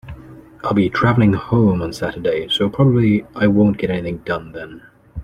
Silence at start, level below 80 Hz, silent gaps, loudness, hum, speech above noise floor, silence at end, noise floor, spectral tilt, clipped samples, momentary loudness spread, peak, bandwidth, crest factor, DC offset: 0.05 s; -42 dBFS; none; -17 LUFS; none; 23 dB; 0 s; -39 dBFS; -7.5 dB/octave; under 0.1%; 19 LU; -2 dBFS; 10.5 kHz; 16 dB; under 0.1%